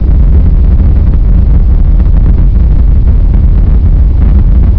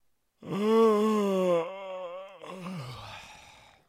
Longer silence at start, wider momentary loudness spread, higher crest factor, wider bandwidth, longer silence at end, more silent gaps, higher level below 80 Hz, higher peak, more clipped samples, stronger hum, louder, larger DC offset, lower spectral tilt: second, 0 s vs 0.4 s; second, 1 LU vs 21 LU; second, 4 dB vs 16 dB; second, 2.5 kHz vs 14.5 kHz; second, 0 s vs 0.45 s; neither; first, -4 dBFS vs -68 dBFS; first, 0 dBFS vs -14 dBFS; first, 10% vs under 0.1%; neither; first, -8 LUFS vs -27 LUFS; neither; first, -12 dB/octave vs -6.5 dB/octave